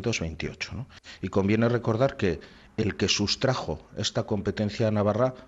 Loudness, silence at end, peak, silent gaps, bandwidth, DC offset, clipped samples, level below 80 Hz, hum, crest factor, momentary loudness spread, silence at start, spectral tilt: -27 LUFS; 0 s; -12 dBFS; none; 8 kHz; under 0.1%; under 0.1%; -52 dBFS; none; 16 dB; 11 LU; 0 s; -5 dB/octave